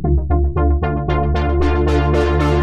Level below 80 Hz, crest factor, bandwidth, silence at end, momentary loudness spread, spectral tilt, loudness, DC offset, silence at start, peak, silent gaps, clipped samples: -18 dBFS; 10 dB; 7.4 kHz; 0 s; 3 LU; -8.5 dB/octave; -17 LUFS; under 0.1%; 0 s; -4 dBFS; none; under 0.1%